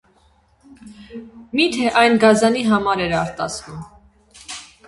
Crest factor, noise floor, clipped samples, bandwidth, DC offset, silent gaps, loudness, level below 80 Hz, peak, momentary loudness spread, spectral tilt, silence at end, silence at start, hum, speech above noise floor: 20 dB; -57 dBFS; under 0.1%; 11.5 kHz; under 0.1%; none; -17 LUFS; -50 dBFS; 0 dBFS; 24 LU; -4.5 dB/octave; 0.25 s; 0.7 s; none; 39 dB